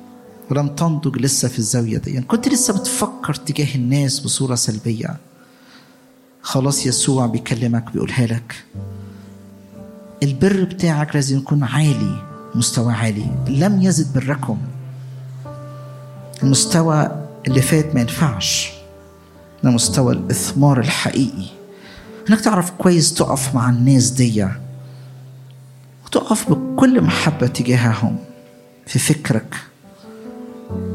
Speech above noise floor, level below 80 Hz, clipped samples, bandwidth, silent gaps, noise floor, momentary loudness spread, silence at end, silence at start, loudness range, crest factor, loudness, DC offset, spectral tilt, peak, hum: 32 dB; -50 dBFS; under 0.1%; 16 kHz; none; -49 dBFS; 19 LU; 0 s; 0 s; 4 LU; 18 dB; -17 LUFS; under 0.1%; -5 dB/octave; -2 dBFS; none